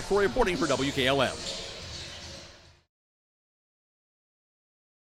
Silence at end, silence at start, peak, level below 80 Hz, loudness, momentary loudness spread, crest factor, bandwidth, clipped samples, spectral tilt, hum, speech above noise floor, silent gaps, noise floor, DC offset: 2.55 s; 0 s; -10 dBFS; -48 dBFS; -28 LUFS; 17 LU; 20 dB; 15.5 kHz; under 0.1%; -4 dB/octave; none; 25 dB; none; -51 dBFS; under 0.1%